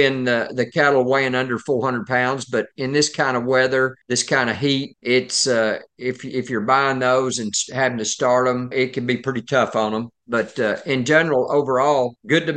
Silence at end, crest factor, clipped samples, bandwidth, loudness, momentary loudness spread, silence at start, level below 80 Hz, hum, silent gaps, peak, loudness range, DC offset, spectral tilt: 0 s; 18 dB; under 0.1%; 10 kHz; -20 LUFS; 7 LU; 0 s; -68 dBFS; none; none; -2 dBFS; 1 LU; under 0.1%; -4 dB/octave